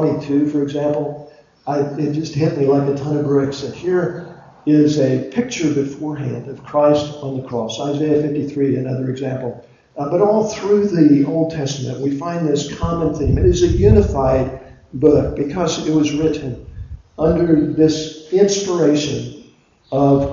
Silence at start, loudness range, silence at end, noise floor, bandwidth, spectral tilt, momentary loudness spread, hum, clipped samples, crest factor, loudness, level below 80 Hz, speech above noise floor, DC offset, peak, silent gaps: 0 s; 3 LU; 0 s; -48 dBFS; 7.6 kHz; -6.5 dB/octave; 12 LU; none; under 0.1%; 16 dB; -17 LUFS; -32 dBFS; 32 dB; under 0.1%; 0 dBFS; none